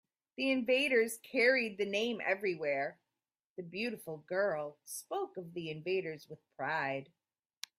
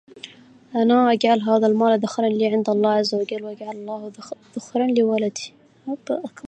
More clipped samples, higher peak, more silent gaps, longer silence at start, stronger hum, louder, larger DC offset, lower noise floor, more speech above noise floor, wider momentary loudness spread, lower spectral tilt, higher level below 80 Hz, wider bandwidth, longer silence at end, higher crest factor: neither; second, -16 dBFS vs -4 dBFS; first, 3.45-3.56 s vs none; first, 0.4 s vs 0.15 s; neither; second, -34 LUFS vs -20 LUFS; neither; first, under -90 dBFS vs -44 dBFS; first, over 55 dB vs 23 dB; about the same, 16 LU vs 18 LU; second, -4 dB/octave vs -5.5 dB/octave; second, -82 dBFS vs -74 dBFS; first, 15.5 kHz vs 8.8 kHz; first, 0.75 s vs 0 s; about the same, 20 dB vs 16 dB